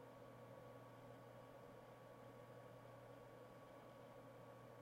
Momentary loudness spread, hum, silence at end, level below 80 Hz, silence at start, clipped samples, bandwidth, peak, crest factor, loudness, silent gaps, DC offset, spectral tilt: 1 LU; none; 0 s; -84 dBFS; 0 s; under 0.1%; 16 kHz; -46 dBFS; 14 dB; -61 LUFS; none; under 0.1%; -6.5 dB/octave